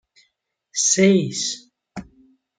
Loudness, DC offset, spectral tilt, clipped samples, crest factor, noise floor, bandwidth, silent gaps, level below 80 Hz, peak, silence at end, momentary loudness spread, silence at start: -19 LUFS; under 0.1%; -3.5 dB/octave; under 0.1%; 20 dB; -71 dBFS; 9.6 kHz; none; -60 dBFS; -4 dBFS; 0.55 s; 23 LU; 0.75 s